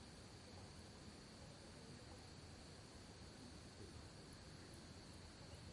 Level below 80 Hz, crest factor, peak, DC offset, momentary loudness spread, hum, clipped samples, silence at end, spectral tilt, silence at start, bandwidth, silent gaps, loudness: -70 dBFS; 14 dB; -44 dBFS; under 0.1%; 1 LU; none; under 0.1%; 0 s; -4.5 dB/octave; 0 s; 11.5 kHz; none; -59 LUFS